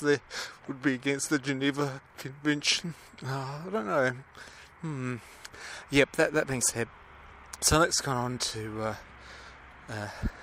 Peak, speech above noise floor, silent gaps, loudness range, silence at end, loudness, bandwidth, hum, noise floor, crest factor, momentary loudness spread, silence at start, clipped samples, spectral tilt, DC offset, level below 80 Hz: -8 dBFS; 20 dB; none; 4 LU; 0 s; -29 LUFS; 16 kHz; none; -51 dBFS; 24 dB; 21 LU; 0 s; under 0.1%; -3.5 dB/octave; under 0.1%; -50 dBFS